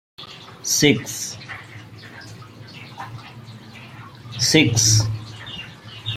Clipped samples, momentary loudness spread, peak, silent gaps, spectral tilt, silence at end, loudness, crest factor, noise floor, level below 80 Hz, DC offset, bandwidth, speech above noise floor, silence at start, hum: under 0.1%; 24 LU; -2 dBFS; none; -3 dB/octave; 0 s; -18 LUFS; 22 dB; -40 dBFS; -52 dBFS; under 0.1%; 16 kHz; 22 dB; 0.2 s; none